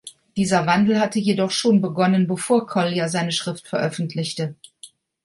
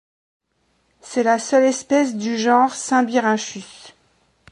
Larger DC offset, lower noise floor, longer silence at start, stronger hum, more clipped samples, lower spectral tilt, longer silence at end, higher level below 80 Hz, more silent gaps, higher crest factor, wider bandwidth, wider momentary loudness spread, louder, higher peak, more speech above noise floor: neither; second, -48 dBFS vs -66 dBFS; second, 0.05 s vs 1.05 s; neither; neither; first, -5 dB/octave vs -3.5 dB/octave; second, 0.4 s vs 0.65 s; first, -62 dBFS vs -68 dBFS; neither; about the same, 16 dB vs 18 dB; about the same, 11.5 kHz vs 11.5 kHz; about the same, 9 LU vs 11 LU; second, -21 LUFS vs -18 LUFS; about the same, -4 dBFS vs -2 dBFS; second, 28 dB vs 48 dB